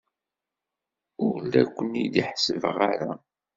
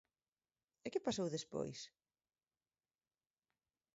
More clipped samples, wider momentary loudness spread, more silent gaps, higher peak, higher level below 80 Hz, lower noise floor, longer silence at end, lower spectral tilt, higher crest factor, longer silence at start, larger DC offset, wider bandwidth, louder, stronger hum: neither; second, 7 LU vs 13 LU; neither; first, -4 dBFS vs -26 dBFS; first, -66 dBFS vs -80 dBFS; about the same, -88 dBFS vs under -90 dBFS; second, 0.4 s vs 2.05 s; about the same, -4 dB/octave vs -5 dB/octave; about the same, 22 dB vs 22 dB; first, 1.2 s vs 0.85 s; neither; about the same, 7.8 kHz vs 7.6 kHz; first, -26 LUFS vs -44 LUFS; neither